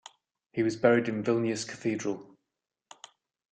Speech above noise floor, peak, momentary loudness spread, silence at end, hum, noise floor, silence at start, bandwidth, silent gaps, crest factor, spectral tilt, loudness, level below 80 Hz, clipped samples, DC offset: 35 dB; -8 dBFS; 12 LU; 1.25 s; none; -63 dBFS; 0.55 s; 9.2 kHz; none; 24 dB; -5.5 dB/octave; -29 LUFS; -72 dBFS; under 0.1%; under 0.1%